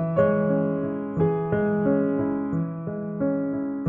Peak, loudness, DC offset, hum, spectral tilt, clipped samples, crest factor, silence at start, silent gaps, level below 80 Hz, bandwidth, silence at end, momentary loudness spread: -8 dBFS; -25 LUFS; under 0.1%; none; -12 dB/octave; under 0.1%; 16 dB; 0 s; none; -56 dBFS; 3.4 kHz; 0 s; 7 LU